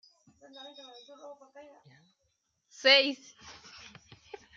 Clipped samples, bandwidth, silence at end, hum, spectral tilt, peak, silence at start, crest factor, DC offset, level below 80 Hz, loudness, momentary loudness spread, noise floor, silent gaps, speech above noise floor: under 0.1%; 7.6 kHz; 1.45 s; none; -1.5 dB/octave; -8 dBFS; 0.65 s; 28 dB; under 0.1%; -78 dBFS; -24 LUFS; 29 LU; -78 dBFS; none; 48 dB